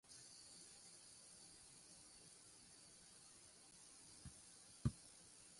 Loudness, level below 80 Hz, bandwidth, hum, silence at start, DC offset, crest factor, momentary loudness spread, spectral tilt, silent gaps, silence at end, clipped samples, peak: -57 LUFS; -68 dBFS; 11.5 kHz; none; 0.05 s; under 0.1%; 30 dB; 14 LU; -4 dB/octave; none; 0 s; under 0.1%; -28 dBFS